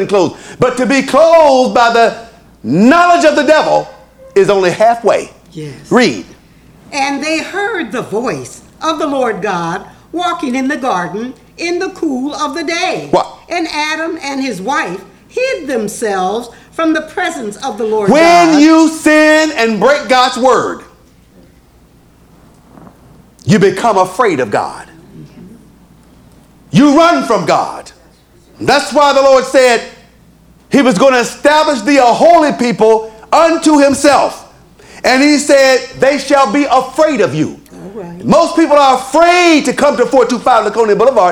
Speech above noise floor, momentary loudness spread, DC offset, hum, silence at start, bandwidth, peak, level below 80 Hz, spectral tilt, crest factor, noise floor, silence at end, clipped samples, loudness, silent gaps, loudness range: 34 dB; 14 LU; under 0.1%; none; 0 s; 16.5 kHz; 0 dBFS; -48 dBFS; -4.5 dB/octave; 12 dB; -44 dBFS; 0 s; 0.4%; -11 LUFS; none; 8 LU